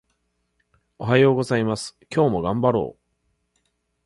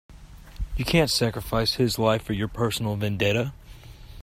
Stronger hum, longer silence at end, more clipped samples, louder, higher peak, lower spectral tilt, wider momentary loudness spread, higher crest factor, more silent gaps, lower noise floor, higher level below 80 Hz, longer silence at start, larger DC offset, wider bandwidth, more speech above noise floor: neither; first, 1.15 s vs 0.05 s; neither; first, -21 LUFS vs -25 LUFS; first, -4 dBFS vs -8 dBFS; first, -6.5 dB/octave vs -5 dB/octave; first, 12 LU vs 9 LU; about the same, 20 dB vs 18 dB; neither; first, -71 dBFS vs -44 dBFS; second, -54 dBFS vs -40 dBFS; first, 1 s vs 0.1 s; neither; second, 11.5 kHz vs 16 kHz; first, 51 dB vs 20 dB